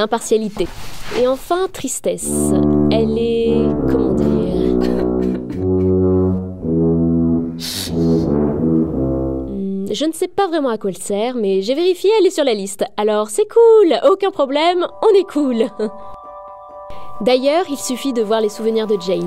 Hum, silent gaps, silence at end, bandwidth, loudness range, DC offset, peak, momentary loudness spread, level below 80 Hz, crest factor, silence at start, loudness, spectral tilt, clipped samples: none; none; 0 s; 16 kHz; 5 LU; 1%; -2 dBFS; 9 LU; -36 dBFS; 14 dB; 0 s; -17 LUFS; -5.5 dB/octave; under 0.1%